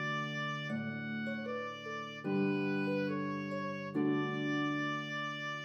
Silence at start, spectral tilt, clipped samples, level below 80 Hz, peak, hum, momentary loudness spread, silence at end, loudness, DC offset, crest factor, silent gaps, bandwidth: 0 s; -6.5 dB/octave; under 0.1%; -86 dBFS; -22 dBFS; none; 6 LU; 0 s; -36 LUFS; under 0.1%; 14 dB; none; 6.8 kHz